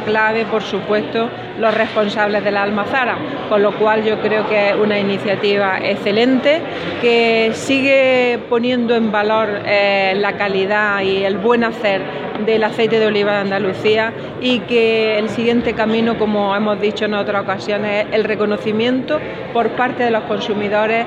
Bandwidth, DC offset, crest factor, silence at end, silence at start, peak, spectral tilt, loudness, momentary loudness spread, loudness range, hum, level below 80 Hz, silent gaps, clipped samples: 10.5 kHz; under 0.1%; 14 dB; 0 s; 0 s; -2 dBFS; -5.5 dB/octave; -16 LUFS; 5 LU; 3 LU; none; -52 dBFS; none; under 0.1%